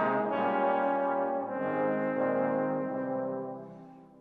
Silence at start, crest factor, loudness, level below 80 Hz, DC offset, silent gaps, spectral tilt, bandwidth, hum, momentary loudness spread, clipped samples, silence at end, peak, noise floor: 0 s; 14 dB; -30 LUFS; -76 dBFS; under 0.1%; none; -9 dB/octave; 4.6 kHz; none; 11 LU; under 0.1%; 0.15 s; -16 dBFS; -50 dBFS